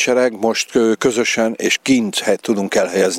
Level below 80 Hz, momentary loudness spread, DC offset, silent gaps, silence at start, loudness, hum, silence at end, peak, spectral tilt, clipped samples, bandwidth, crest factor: -58 dBFS; 3 LU; under 0.1%; none; 0 s; -16 LUFS; none; 0 s; 0 dBFS; -3 dB/octave; under 0.1%; 16 kHz; 16 dB